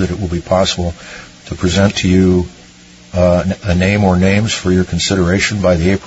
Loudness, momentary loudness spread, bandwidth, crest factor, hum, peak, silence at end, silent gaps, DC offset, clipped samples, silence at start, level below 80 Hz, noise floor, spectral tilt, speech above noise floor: -14 LUFS; 11 LU; 8 kHz; 14 dB; none; 0 dBFS; 0 s; none; under 0.1%; under 0.1%; 0 s; -36 dBFS; -40 dBFS; -5.5 dB/octave; 27 dB